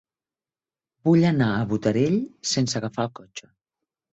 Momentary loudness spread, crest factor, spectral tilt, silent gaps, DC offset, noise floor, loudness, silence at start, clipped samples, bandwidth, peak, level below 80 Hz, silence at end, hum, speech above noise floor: 15 LU; 18 dB; -5.5 dB/octave; none; under 0.1%; under -90 dBFS; -23 LUFS; 1.05 s; under 0.1%; 8.2 kHz; -8 dBFS; -58 dBFS; 0.75 s; none; over 67 dB